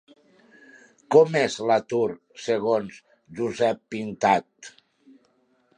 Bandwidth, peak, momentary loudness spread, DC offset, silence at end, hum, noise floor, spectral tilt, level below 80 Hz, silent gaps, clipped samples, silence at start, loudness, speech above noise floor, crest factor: 9.8 kHz; -4 dBFS; 22 LU; under 0.1%; 1.1 s; none; -65 dBFS; -5 dB/octave; -68 dBFS; none; under 0.1%; 1.1 s; -23 LUFS; 42 dB; 22 dB